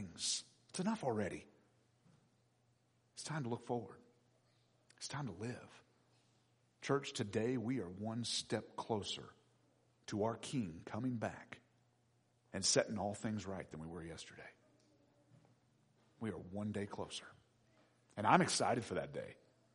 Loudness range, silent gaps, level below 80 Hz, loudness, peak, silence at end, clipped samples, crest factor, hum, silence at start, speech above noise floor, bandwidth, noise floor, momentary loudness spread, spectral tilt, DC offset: 10 LU; none; -76 dBFS; -41 LUFS; -12 dBFS; 0.4 s; under 0.1%; 30 dB; none; 0 s; 36 dB; 10.5 kHz; -76 dBFS; 19 LU; -4 dB/octave; under 0.1%